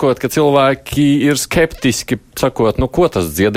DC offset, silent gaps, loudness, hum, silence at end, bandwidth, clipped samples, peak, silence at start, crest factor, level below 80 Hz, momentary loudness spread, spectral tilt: under 0.1%; none; -14 LUFS; none; 0 s; 16.5 kHz; under 0.1%; -2 dBFS; 0 s; 12 dB; -34 dBFS; 6 LU; -5 dB/octave